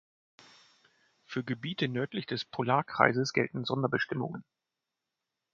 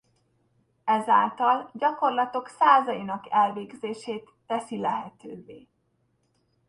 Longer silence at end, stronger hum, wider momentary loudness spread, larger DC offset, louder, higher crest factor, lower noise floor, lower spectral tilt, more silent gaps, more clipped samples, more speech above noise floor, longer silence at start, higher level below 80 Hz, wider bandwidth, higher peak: about the same, 1.1 s vs 1.1 s; neither; second, 12 LU vs 16 LU; neither; second, -31 LUFS vs -25 LUFS; first, 28 dB vs 20 dB; first, -88 dBFS vs -71 dBFS; about the same, -5.5 dB/octave vs -5 dB/octave; neither; neither; first, 57 dB vs 46 dB; first, 1.3 s vs 0.85 s; about the same, -72 dBFS vs -74 dBFS; second, 7.6 kHz vs 11 kHz; about the same, -4 dBFS vs -6 dBFS